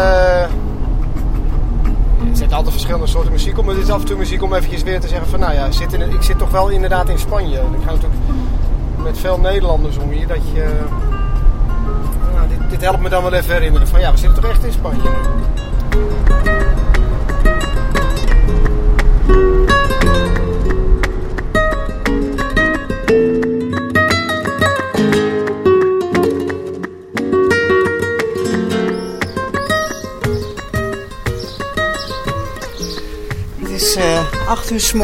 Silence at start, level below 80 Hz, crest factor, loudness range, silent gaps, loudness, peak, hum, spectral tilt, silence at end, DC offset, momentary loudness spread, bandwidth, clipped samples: 0 s; -16 dBFS; 12 dB; 4 LU; none; -17 LUFS; 0 dBFS; none; -5.5 dB/octave; 0 s; under 0.1%; 8 LU; 16 kHz; under 0.1%